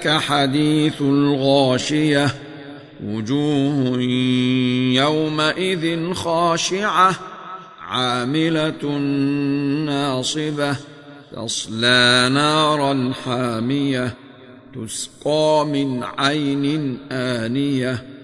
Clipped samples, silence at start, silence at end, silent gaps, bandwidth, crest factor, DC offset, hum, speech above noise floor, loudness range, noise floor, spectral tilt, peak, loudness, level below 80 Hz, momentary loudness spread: under 0.1%; 0 s; 0 s; none; 12.5 kHz; 16 dB; under 0.1%; none; 23 dB; 4 LU; -42 dBFS; -4.5 dB/octave; -2 dBFS; -19 LUFS; -56 dBFS; 12 LU